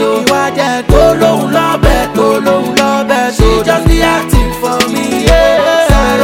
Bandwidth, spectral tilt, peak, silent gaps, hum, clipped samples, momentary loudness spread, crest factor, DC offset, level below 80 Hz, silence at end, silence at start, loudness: 17 kHz; -5 dB/octave; 0 dBFS; none; none; 2%; 4 LU; 8 dB; under 0.1%; -16 dBFS; 0 s; 0 s; -10 LUFS